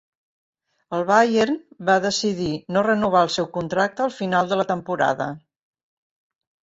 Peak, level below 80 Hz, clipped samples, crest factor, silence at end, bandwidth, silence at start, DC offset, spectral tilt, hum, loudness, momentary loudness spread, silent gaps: -4 dBFS; -58 dBFS; under 0.1%; 20 dB; 1.3 s; 8 kHz; 0.9 s; under 0.1%; -4.5 dB/octave; none; -21 LUFS; 9 LU; none